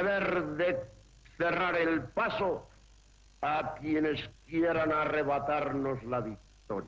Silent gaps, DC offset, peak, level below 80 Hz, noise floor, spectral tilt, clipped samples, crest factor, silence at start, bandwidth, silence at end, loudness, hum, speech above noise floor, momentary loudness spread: none; under 0.1%; -20 dBFS; -58 dBFS; -59 dBFS; -7 dB/octave; under 0.1%; 12 dB; 0 s; 7.8 kHz; 0 s; -31 LUFS; none; 28 dB; 9 LU